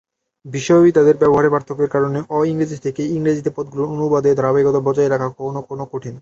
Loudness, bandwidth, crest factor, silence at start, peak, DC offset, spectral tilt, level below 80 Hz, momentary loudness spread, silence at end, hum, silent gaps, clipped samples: -17 LUFS; 7.8 kHz; 14 dB; 0.45 s; -2 dBFS; under 0.1%; -7.5 dB/octave; -54 dBFS; 14 LU; 0 s; none; none; under 0.1%